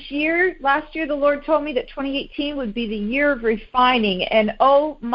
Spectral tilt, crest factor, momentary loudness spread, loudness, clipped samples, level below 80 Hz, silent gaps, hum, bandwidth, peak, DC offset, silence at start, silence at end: -8.5 dB/octave; 16 dB; 9 LU; -20 LUFS; under 0.1%; -46 dBFS; none; none; 5.6 kHz; -4 dBFS; under 0.1%; 0 s; 0 s